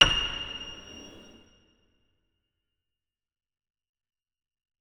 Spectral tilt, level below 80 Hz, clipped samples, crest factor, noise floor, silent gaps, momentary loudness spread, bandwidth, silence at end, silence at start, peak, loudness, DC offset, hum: -1.5 dB/octave; -48 dBFS; under 0.1%; 32 dB; -89 dBFS; none; 24 LU; 13 kHz; 3.6 s; 0 s; -2 dBFS; -27 LUFS; under 0.1%; none